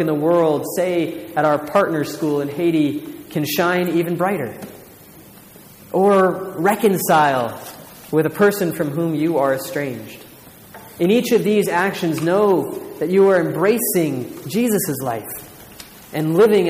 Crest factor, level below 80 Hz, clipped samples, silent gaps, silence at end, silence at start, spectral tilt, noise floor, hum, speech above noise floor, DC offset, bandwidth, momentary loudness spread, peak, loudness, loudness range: 14 dB; -60 dBFS; under 0.1%; none; 0 s; 0 s; -5.5 dB/octave; -43 dBFS; none; 25 dB; under 0.1%; 15.5 kHz; 15 LU; -4 dBFS; -18 LUFS; 3 LU